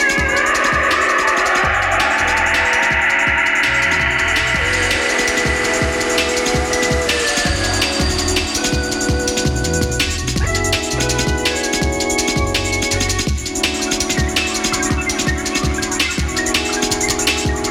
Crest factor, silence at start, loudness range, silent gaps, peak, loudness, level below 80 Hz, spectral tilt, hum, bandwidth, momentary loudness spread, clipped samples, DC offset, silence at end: 14 dB; 0 s; 3 LU; none; -2 dBFS; -16 LUFS; -28 dBFS; -3 dB/octave; none; 18 kHz; 4 LU; under 0.1%; under 0.1%; 0 s